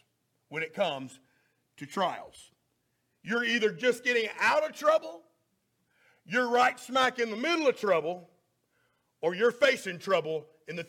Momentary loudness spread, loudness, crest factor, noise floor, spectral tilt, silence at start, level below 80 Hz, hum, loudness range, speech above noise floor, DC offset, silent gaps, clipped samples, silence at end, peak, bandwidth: 14 LU; -28 LUFS; 18 dB; -77 dBFS; -3.5 dB/octave; 0.5 s; -80 dBFS; none; 5 LU; 48 dB; under 0.1%; none; under 0.1%; 0.05 s; -12 dBFS; 16.5 kHz